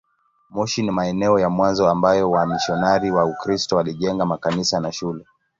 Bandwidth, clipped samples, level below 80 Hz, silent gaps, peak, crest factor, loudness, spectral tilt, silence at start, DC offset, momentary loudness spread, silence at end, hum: 7.8 kHz; under 0.1%; -50 dBFS; none; -2 dBFS; 18 dB; -20 LUFS; -5 dB/octave; 0.5 s; under 0.1%; 9 LU; 0.35 s; none